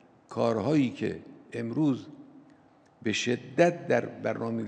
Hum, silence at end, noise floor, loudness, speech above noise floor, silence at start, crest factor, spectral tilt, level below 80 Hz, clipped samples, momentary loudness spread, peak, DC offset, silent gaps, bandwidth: none; 0 s; -59 dBFS; -29 LUFS; 31 dB; 0.3 s; 22 dB; -6 dB/octave; -72 dBFS; under 0.1%; 13 LU; -8 dBFS; under 0.1%; none; 9.4 kHz